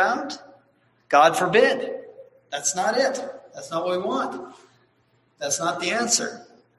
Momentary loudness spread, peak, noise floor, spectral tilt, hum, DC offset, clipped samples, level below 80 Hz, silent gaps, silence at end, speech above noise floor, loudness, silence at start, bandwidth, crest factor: 20 LU; -2 dBFS; -64 dBFS; -2 dB/octave; none; under 0.1%; under 0.1%; -70 dBFS; none; 0.35 s; 42 dB; -22 LUFS; 0 s; 12.5 kHz; 22 dB